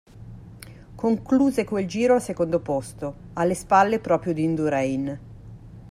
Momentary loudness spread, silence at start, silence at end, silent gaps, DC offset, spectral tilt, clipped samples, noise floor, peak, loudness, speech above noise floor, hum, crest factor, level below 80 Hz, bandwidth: 24 LU; 0.15 s; 0.05 s; none; under 0.1%; -6.5 dB/octave; under 0.1%; -43 dBFS; -6 dBFS; -23 LUFS; 21 dB; none; 18 dB; -50 dBFS; 14.5 kHz